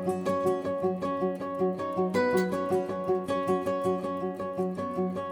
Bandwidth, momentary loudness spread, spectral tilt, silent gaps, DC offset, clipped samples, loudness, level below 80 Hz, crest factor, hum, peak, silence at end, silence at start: over 20 kHz; 5 LU; -7 dB/octave; none; under 0.1%; under 0.1%; -29 LUFS; -66 dBFS; 16 dB; none; -14 dBFS; 0 s; 0 s